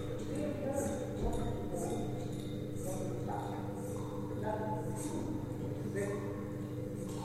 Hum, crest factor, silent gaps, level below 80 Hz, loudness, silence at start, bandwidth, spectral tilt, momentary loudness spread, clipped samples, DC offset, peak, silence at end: 50 Hz at -50 dBFS; 14 dB; none; -52 dBFS; -39 LUFS; 0 s; 16 kHz; -6.5 dB/octave; 4 LU; under 0.1%; under 0.1%; -24 dBFS; 0 s